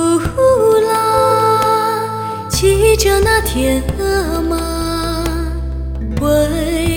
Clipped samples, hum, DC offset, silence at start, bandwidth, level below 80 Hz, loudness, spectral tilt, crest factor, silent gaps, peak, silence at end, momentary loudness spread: under 0.1%; none; under 0.1%; 0 s; 18 kHz; -24 dBFS; -14 LUFS; -5 dB/octave; 14 dB; none; 0 dBFS; 0 s; 10 LU